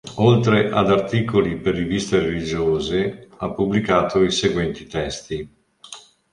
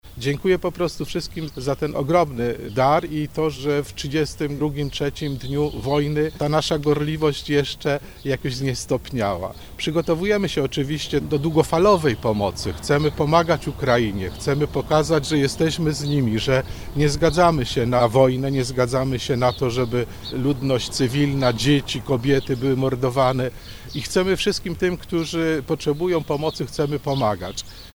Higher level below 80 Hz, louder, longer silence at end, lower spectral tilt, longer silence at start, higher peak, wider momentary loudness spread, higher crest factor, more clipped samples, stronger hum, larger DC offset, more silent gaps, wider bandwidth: about the same, -44 dBFS vs -40 dBFS; about the same, -20 LUFS vs -22 LUFS; first, 0.35 s vs 0.05 s; about the same, -6 dB/octave vs -5.5 dB/octave; about the same, 0.05 s vs 0.05 s; about the same, -2 dBFS vs -2 dBFS; first, 14 LU vs 8 LU; about the same, 18 dB vs 20 dB; neither; neither; neither; neither; second, 11 kHz vs over 20 kHz